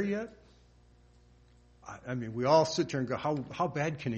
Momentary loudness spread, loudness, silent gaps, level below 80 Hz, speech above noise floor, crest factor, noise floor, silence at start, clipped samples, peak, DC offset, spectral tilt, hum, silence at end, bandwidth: 20 LU; -31 LUFS; none; -62 dBFS; 30 dB; 22 dB; -61 dBFS; 0 s; under 0.1%; -10 dBFS; under 0.1%; -5.5 dB/octave; 60 Hz at -60 dBFS; 0 s; 8.4 kHz